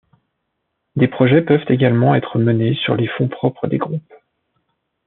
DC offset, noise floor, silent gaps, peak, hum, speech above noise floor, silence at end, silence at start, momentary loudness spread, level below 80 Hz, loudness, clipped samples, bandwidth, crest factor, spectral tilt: under 0.1%; -73 dBFS; none; -2 dBFS; none; 58 dB; 1.05 s; 0.95 s; 8 LU; -60 dBFS; -16 LUFS; under 0.1%; 4.1 kHz; 16 dB; -6.5 dB/octave